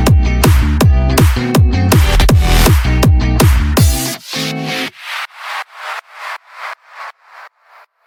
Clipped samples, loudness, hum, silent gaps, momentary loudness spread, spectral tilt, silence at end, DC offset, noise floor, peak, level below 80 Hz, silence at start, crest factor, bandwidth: under 0.1%; -12 LUFS; none; none; 16 LU; -5 dB/octave; 0.6 s; under 0.1%; -46 dBFS; 0 dBFS; -16 dBFS; 0 s; 12 dB; 19 kHz